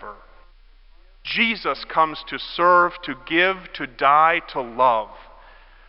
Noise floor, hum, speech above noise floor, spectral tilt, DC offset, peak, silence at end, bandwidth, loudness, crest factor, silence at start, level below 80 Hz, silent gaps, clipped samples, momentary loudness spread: -50 dBFS; none; 29 dB; -8 dB/octave; under 0.1%; -4 dBFS; 0.65 s; 5.8 kHz; -20 LUFS; 18 dB; 0 s; -50 dBFS; none; under 0.1%; 16 LU